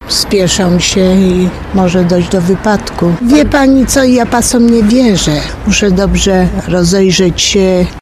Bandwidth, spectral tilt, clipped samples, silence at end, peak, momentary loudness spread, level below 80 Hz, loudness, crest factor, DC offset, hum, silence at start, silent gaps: 14.5 kHz; -4.5 dB/octave; 0.2%; 0 s; 0 dBFS; 5 LU; -24 dBFS; -9 LUFS; 8 dB; under 0.1%; none; 0 s; none